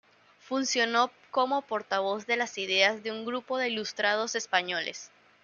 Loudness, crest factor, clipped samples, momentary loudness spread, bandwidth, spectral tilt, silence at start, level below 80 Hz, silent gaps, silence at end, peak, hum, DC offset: -28 LUFS; 22 dB; under 0.1%; 9 LU; 7.4 kHz; -1.5 dB/octave; 0.45 s; -82 dBFS; none; 0.35 s; -8 dBFS; none; under 0.1%